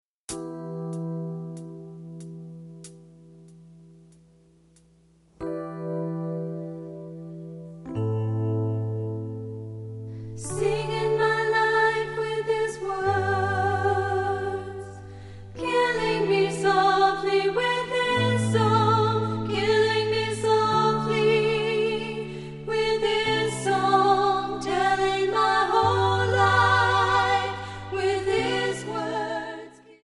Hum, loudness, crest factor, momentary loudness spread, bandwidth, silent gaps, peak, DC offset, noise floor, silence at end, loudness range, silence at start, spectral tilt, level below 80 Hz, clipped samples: none; -24 LUFS; 18 dB; 18 LU; 11.5 kHz; none; -6 dBFS; under 0.1%; -59 dBFS; 0.1 s; 15 LU; 0.3 s; -5 dB/octave; -54 dBFS; under 0.1%